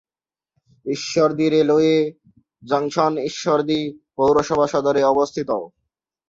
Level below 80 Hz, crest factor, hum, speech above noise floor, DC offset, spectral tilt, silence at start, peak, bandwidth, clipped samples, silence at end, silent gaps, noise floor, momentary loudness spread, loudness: -58 dBFS; 16 dB; none; over 71 dB; under 0.1%; -5.5 dB/octave; 0.85 s; -4 dBFS; 7.8 kHz; under 0.1%; 0.6 s; none; under -90 dBFS; 10 LU; -19 LUFS